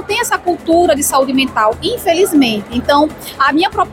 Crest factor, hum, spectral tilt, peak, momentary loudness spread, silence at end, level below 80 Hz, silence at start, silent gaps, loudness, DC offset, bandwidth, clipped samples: 12 dB; none; -3 dB/octave; -2 dBFS; 5 LU; 0 s; -40 dBFS; 0 s; none; -13 LUFS; under 0.1%; 17 kHz; under 0.1%